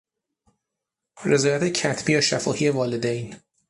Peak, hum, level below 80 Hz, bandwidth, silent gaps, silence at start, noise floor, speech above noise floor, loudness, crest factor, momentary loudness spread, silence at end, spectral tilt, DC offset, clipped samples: -6 dBFS; none; -62 dBFS; 11.5 kHz; none; 1.15 s; -84 dBFS; 62 dB; -22 LUFS; 18 dB; 10 LU; 0.35 s; -4 dB/octave; under 0.1%; under 0.1%